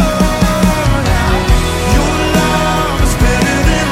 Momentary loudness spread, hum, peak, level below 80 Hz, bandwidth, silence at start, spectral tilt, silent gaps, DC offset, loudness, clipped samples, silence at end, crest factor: 2 LU; none; 0 dBFS; -16 dBFS; 16.5 kHz; 0 s; -5 dB/octave; none; under 0.1%; -12 LUFS; under 0.1%; 0 s; 12 dB